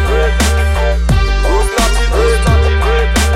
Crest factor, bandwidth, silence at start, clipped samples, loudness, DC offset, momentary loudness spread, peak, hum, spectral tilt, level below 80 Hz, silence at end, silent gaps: 8 dB; 15.5 kHz; 0 s; under 0.1%; -13 LUFS; under 0.1%; 2 LU; -2 dBFS; none; -5 dB/octave; -12 dBFS; 0 s; none